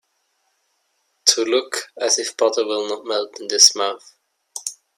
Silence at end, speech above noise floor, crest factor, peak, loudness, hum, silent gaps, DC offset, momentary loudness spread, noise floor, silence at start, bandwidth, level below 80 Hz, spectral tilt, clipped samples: 0.25 s; 49 dB; 22 dB; 0 dBFS; -18 LUFS; none; none; under 0.1%; 18 LU; -69 dBFS; 1.25 s; 16 kHz; -78 dBFS; 1 dB/octave; under 0.1%